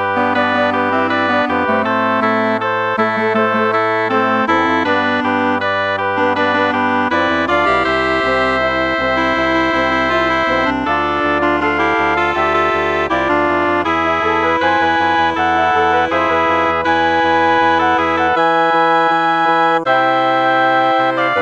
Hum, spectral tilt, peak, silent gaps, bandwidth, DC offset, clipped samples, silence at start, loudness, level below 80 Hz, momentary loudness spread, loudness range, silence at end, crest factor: none; -5.5 dB/octave; -2 dBFS; none; 9.2 kHz; under 0.1%; under 0.1%; 0 s; -14 LUFS; -42 dBFS; 3 LU; 2 LU; 0 s; 14 dB